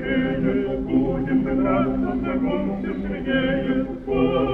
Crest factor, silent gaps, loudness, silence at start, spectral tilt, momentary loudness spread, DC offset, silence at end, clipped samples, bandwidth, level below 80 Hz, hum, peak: 14 dB; none; -23 LUFS; 0 s; -9.5 dB/octave; 5 LU; under 0.1%; 0 s; under 0.1%; 4.1 kHz; -38 dBFS; none; -8 dBFS